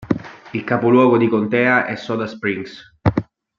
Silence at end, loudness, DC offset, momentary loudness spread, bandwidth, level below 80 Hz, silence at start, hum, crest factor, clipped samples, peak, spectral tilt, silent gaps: 0.35 s; -18 LUFS; under 0.1%; 14 LU; 7.2 kHz; -46 dBFS; 0 s; none; 18 dB; under 0.1%; 0 dBFS; -8 dB/octave; none